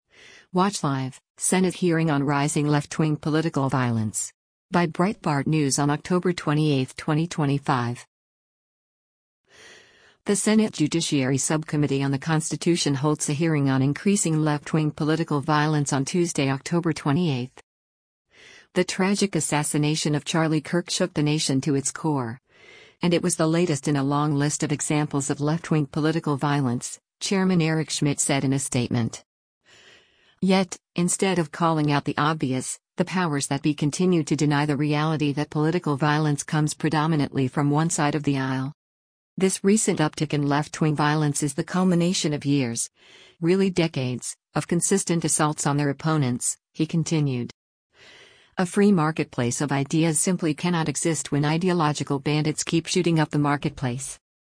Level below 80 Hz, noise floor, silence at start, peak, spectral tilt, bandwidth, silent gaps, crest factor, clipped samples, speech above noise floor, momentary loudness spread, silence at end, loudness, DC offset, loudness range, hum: -60 dBFS; -58 dBFS; 0.55 s; -6 dBFS; -5 dB/octave; 10.5 kHz; 1.30-1.35 s, 4.34-4.69 s, 8.07-9.44 s, 17.63-18.25 s, 29.26-29.61 s, 38.74-39.37 s, 47.54-47.90 s; 16 dB; under 0.1%; 35 dB; 6 LU; 0.3 s; -23 LUFS; under 0.1%; 3 LU; none